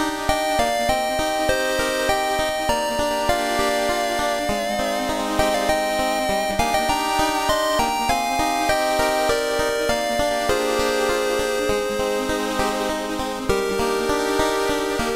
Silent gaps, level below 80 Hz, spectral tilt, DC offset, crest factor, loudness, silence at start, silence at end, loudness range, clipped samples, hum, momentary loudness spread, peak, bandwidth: none; -38 dBFS; -3 dB/octave; under 0.1%; 16 dB; -21 LUFS; 0 s; 0 s; 2 LU; under 0.1%; none; 3 LU; -4 dBFS; 16 kHz